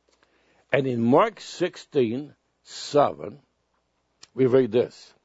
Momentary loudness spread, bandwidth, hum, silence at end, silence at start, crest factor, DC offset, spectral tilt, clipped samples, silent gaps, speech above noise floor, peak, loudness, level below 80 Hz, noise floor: 19 LU; 8 kHz; none; 0.35 s; 0.7 s; 20 dB; under 0.1%; -6.5 dB/octave; under 0.1%; none; 49 dB; -6 dBFS; -24 LUFS; -70 dBFS; -72 dBFS